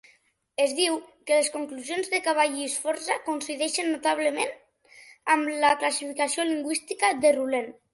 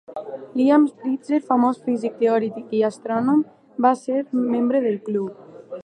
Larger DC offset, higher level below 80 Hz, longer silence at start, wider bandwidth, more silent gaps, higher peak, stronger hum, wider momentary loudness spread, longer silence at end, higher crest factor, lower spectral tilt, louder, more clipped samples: neither; about the same, -72 dBFS vs -74 dBFS; first, 0.6 s vs 0.1 s; first, 12 kHz vs 9.6 kHz; neither; second, -8 dBFS vs -4 dBFS; neither; about the same, 9 LU vs 11 LU; first, 0.2 s vs 0 s; about the same, 18 dB vs 18 dB; second, -0.5 dB/octave vs -7 dB/octave; second, -26 LUFS vs -21 LUFS; neither